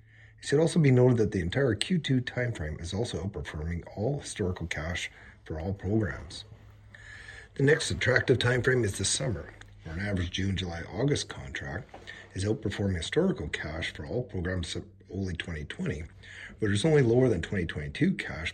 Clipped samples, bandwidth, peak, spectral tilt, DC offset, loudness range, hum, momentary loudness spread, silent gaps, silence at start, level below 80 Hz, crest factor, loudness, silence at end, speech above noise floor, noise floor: under 0.1%; 12.5 kHz; -8 dBFS; -5.5 dB/octave; under 0.1%; 7 LU; none; 17 LU; none; 0.2 s; -48 dBFS; 22 dB; -29 LUFS; 0 s; 23 dB; -51 dBFS